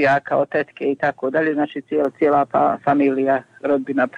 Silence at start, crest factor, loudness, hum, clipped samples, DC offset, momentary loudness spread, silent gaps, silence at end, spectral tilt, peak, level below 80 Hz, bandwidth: 0 s; 12 dB; -19 LUFS; none; under 0.1%; under 0.1%; 5 LU; none; 0 s; -7.5 dB/octave; -8 dBFS; -64 dBFS; 7.6 kHz